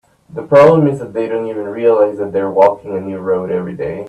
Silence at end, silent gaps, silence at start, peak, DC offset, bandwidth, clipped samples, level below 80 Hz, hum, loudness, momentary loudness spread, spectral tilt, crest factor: 0 s; none; 0.3 s; 0 dBFS; under 0.1%; 9 kHz; under 0.1%; -54 dBFS; none; -14 LUFS; 14 LU; -8.5 dB/octave; 14 dB